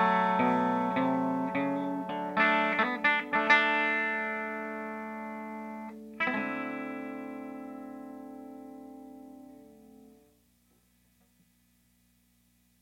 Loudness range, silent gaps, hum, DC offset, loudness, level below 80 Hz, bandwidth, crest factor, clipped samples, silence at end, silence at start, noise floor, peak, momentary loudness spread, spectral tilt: 20 LU; none; 60 Hz at -70 dBFS; under 0.1%; -29 LUFS; -72 dBFS; 16 kHz; 22 dB; under 0.1%; 2.75 s; 0 s; -68 dBFS; -10 dBFS; 21 LU; -6 dB/octave